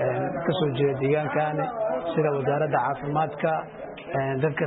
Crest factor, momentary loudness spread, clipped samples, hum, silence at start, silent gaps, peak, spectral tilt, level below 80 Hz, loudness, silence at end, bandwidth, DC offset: 16 dB; 5 LU; under 0.1%; none; 0 s; none; -10 dBFS; -11.5 dB/octave; -58 dBFS; -26 LUFS; 0 s; 4.1 kHz; under 0.1%